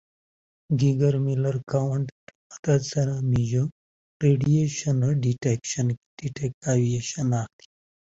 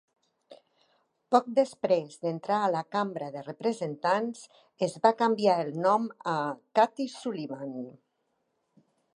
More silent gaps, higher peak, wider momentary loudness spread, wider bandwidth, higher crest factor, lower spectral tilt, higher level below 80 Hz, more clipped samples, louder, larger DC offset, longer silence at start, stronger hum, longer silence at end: first, 2.12-2.27 s, 2.35-2.50 s, 2.59-2.63 s, 3.72-4.20 s, 5.97-6.17 s, 6.54-6.61 s vs none; about the same, -8 dBFS vs -6 dBFS; second, 9 LU vs 12 LU; second, 8 kHz vs 11.5 kHz; second, 16 dB vs 22 dB; about the same, -6.5 dB/octave vs -5.5 dB/octave; first, -54 dBFS vs -84 dBFS; neither; first, -25 LUFS vs -29 LUFS; neither; first, 0.7 s vs 0.5 s; neither; second, 0.7 s vs 1.25 s